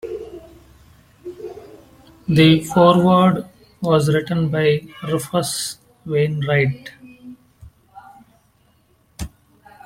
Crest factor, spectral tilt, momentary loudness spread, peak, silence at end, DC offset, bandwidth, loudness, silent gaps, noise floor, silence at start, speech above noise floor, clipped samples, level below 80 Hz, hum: 20 dB; -6 dB/octave; 23 LU; -2 dBFS; 0.6 s; under 0.1%; 16 kHz; -17 LUFS; none; -58 dBFS; 0.05 s; 42 dB; under 0.1%; -48 dBFS; none